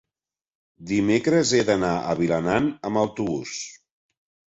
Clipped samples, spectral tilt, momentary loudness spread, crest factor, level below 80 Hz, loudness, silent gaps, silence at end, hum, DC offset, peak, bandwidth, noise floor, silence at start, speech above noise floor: under 0.1%; -5 dB/octave; 10 LU; 18 dB; -54 dBFS; -23 LUFS; none; 0.75 s; none; under 0.1%; -6 dBFS; 8 kHz; under -90 dBFS; 0.8 s; over 68 dB